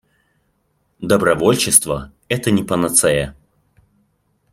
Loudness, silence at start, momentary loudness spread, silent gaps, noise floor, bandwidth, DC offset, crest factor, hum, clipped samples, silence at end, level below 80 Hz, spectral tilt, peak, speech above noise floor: -16 LUFS; 1 s; 13 LU; none; -65 dBFS; 16.5 kHz; under 0.1%; 20 dB; none; under 0.1%; 1.2 s; -46 dBFS; -3.5 dB/octave; 0 dBFS; 49 dB